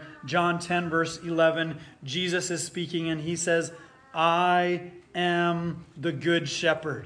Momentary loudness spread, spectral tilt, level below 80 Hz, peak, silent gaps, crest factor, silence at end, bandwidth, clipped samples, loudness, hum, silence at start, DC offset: 10 LU; -4.5 dB/octave; -64 dBFS; -8 dBFS; none; 18 dB; 0 s; 10.5 kHz; under 0.1%; -27 LUFS; none; 0 s; under 0.1%